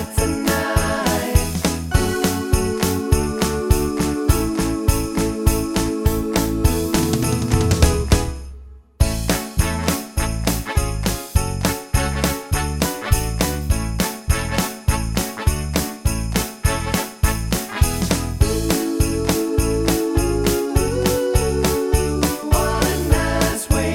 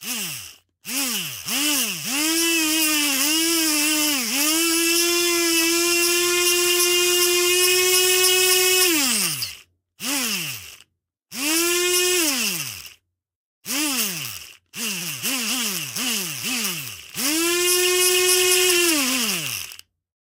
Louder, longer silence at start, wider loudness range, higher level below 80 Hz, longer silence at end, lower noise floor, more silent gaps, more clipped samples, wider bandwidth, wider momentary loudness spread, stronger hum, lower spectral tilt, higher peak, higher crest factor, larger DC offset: about the same, -20 LUFS vs -18 LUFS; about the same, 0 s vs 0 s; second, 3 LU vs 8 LU; first, -24 dBFS vs -66 dBFS; second, 0 s vs 0.55 s; second, -39 dBFS vs -63 dBFS; second, none vs 13.36-13.62 s; neither; about the same, 17 kHz vs 17 kHz; second, 4 LU vs 13 LU; neither; first, -5 dB/octave vs -0.5 dB/octave; about the same, 0 dBFS vs -2 dBFS; about the same, 18 dB vs 20 dB; neither